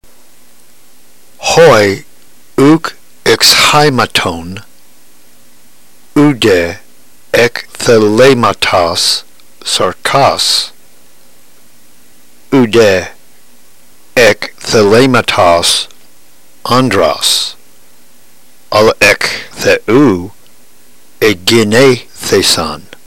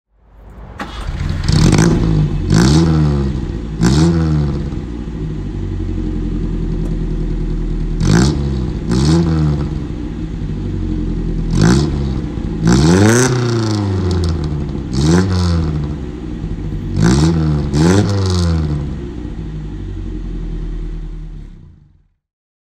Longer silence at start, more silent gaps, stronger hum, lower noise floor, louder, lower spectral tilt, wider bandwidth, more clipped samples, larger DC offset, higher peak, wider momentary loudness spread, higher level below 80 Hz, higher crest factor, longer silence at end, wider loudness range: second, 0 s vs 0.4 s; neither; neither; second, -45 dBFS vs -50 dBFS; first, -9 LUFS vs -16 LUFS; second, -3.5 dB/octave vs -6 dB/octave; first, 16 kHz vs 13 kHz; first, 0.3% vs under 0.1%; first, 2% vs under 0.1%; about the same, 0 dBFS vs 0 dBFS; about the same, 12 LU vs 14 LU; second, -40 dBFS vs -22 dBFS; about the same, 12 dB vs 16 dB; second, 0.25 s vs 1.1 s; second, 5 LU vs 8 LU